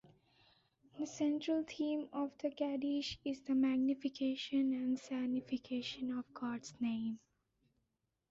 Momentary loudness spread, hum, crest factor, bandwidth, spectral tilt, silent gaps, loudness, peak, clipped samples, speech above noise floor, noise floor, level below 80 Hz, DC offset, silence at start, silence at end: 8 LU; none; 14 dB; 7.6 kHz; -4 dB/octave; none; -39 LUFS; -26 dBFS; under 0.1%; 48 dB; -86 dBFS; -76 dBFS; under 0.1%; 0.95 s; 1.15 s